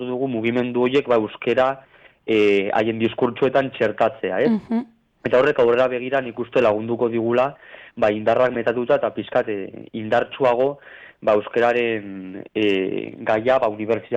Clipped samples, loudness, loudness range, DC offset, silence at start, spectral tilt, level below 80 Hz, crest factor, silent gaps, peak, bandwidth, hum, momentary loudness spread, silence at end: under 0.1%; -21 LUFS; 2 LU; under 0.1%; 0 s; -7 dB/octave; -58 dBFS; 14 dB; none; -6 dBFS; 8 kHz; none; 10 LU; 0 s